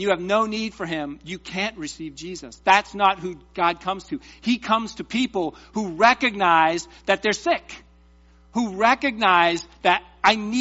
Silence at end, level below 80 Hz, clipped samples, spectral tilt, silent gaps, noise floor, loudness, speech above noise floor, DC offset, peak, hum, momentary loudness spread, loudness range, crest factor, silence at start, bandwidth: 0 s; -54 dBFS; under 0.1%; -1.5 dB/octave; none; -53 dBFS; -22 LUFS; 31 dB; under 0.1%; -2 dBFS; none; 15 LU; 3 LU; 20 dB; 0 s; 8 kHz